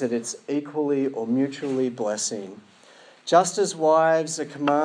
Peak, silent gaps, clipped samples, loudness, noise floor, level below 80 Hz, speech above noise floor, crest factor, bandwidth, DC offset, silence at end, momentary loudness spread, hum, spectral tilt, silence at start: -6 dBFS; none; under 0.1%; -23 LUFS; -51 dBFS; -84 dBFS; 28 dB; 18 dB; 10.5 kHz; under 0.1%; 0 s; 10 LU; none; -4 dB/octave; 0 s